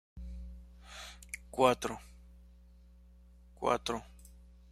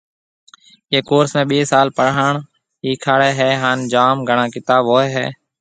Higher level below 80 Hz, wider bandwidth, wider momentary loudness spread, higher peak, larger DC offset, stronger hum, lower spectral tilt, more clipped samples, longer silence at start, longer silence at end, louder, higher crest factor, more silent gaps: first, -52 dBFS vs -60 dBFS; first, 15.5 kHz vs 9.4 kHz; first, 25 LU vs 8 LU; second, -12 dBFS vs 0 dBFS; neither; neither; about the same, -4 dB/octave vs -5 dB/octave; neither; second, 0.15 s vs 0.9 s; about the same, 0.2 s vs 0.3 s; second, -34 LUFS vs -16 LUFS; first, 26 dB vs 16 dB; neither